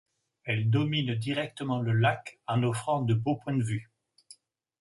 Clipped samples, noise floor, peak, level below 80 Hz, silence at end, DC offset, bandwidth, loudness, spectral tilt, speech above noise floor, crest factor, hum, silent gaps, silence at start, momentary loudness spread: under 0.1%; -58 dBFS; -12 dBFS; -62 dBFS; 1 s; under 0.1%; 11.5 kHz; -29 LUFS; -6.5 dB/octave; 30 dB; 18 dB; none; none; 0.45 s; 7 LU